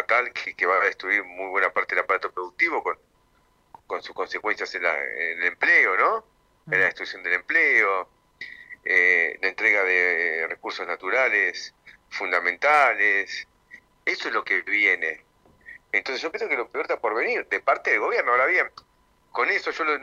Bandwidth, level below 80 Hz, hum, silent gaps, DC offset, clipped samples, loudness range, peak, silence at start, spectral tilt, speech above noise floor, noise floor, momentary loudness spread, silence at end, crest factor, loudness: 11.5 kHz; -68 dBFS; none; none; under 0.1%; under 0.1%; 5 LU; -6 dBFS; 0 s; -2.5 dB/octave; 39 dB; -63 dBFS; 14 LU; 0 s; 18 dB; -22 LUFS